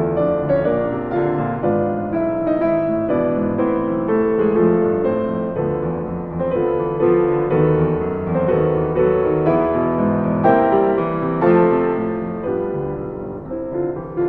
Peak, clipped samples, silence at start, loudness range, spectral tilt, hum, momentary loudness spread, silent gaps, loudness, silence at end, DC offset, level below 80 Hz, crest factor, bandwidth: -2 dBFS; under 0.1%; 0 s; 3 LU; -11.5 dB/octave; none; 8 LU; none; -18 LUFS; 0 s; under 0.1%; -42 dBFS; 16 dB; 4.3 kHz